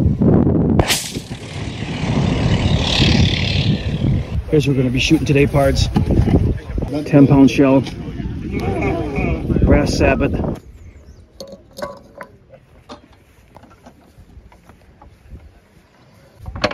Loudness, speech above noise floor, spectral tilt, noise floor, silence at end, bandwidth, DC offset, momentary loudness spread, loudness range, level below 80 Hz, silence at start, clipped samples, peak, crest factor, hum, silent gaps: -16 LUFS; 36 dB; -6 dB/octave; -49 dBFS; 0 s; 16 kHz; under 0.1%; 17 LU; 17 LU; -28 dBFS; 0 s; under 0.1%; 0 dBFS; 16 dB; none; none